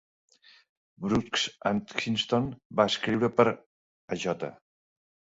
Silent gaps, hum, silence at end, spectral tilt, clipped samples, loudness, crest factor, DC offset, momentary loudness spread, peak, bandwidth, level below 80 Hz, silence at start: 2.65-2.70 s, 3.66-4.08 s; none; 0.8 s; -5 dB/octave; under 0.1%; -28 LUFS; 24 dB; under 0.1%; 12 LU; -6 dBFS; 8 kHz; -60 dBFS; 1 s